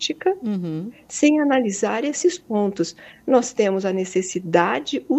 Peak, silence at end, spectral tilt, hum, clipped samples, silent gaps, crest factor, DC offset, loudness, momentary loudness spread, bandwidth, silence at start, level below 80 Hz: -2 dBFS; 0 s; -4.5 dB/octave; none; under 0.1%; none; 18 dB; under 0.1%; -21 LUFS; 9 LU; 8.6 kHz; 0 s; -64 dBFS